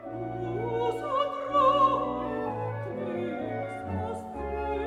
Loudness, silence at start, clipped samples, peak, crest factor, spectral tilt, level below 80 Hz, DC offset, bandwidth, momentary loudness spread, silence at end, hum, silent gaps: -29 LUFS; 0 s; under 0.1%; -12 dBFS; 18 dB; -7 dB/octave; -50 dBFS; under 0.1%; 12 kHz; 11 LU; 0 s; none; none